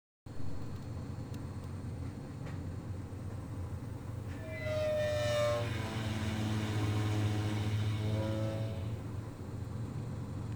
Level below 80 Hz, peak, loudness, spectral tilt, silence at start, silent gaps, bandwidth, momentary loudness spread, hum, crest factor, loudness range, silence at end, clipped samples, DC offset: -54 dBFS; -22 dBFS; -37 LUFS; -6.5 dB/octave; 0.25 s; none; over 20 kHz; 10 LU; none; 14 dB; 9 LU; 0 s; under 0.1%; under 0.1%